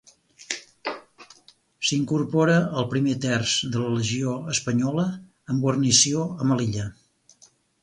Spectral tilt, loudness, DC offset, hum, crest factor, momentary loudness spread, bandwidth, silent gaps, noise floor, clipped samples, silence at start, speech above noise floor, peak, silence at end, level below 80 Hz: -4 dB/octave; -23 LUFS; under 0.1%; none; 20 dB; 15 LU; 11.5 kHz; none; -58 dBFS; under 0.1%; 0.4 s; 35 dB; -6 dBFS; 0.9 s; -58 dBFS